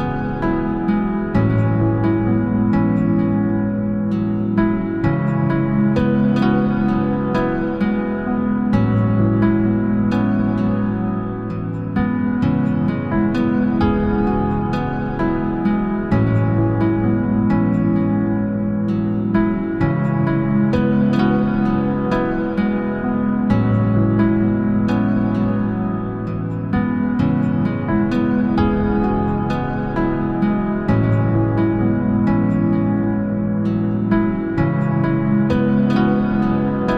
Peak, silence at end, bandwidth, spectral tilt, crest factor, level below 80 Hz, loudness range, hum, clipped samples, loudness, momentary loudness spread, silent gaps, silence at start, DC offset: -4 dBFS; 0 s; 5.4 kHz; -10 dB/octave; 12 dB; -34 dBFS; 1 LU; none; under 0.1%; -18 LUFS; 4 LU; none; 0 s; under 0.1%